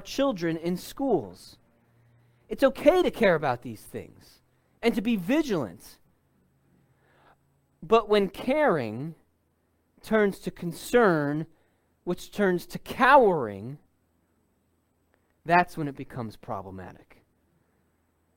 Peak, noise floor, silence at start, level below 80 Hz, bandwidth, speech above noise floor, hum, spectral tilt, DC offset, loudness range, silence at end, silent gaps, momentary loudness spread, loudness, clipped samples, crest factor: -6 dBFS; -70 dBFS; 0 s; -56 dBFS; 17 kHz; 45 dB; none; -6 dB/octave; under 0.1%; 7 LU; 1.45 s; none; 18 LU; -25 LUFS; under 0.1%; 22 dB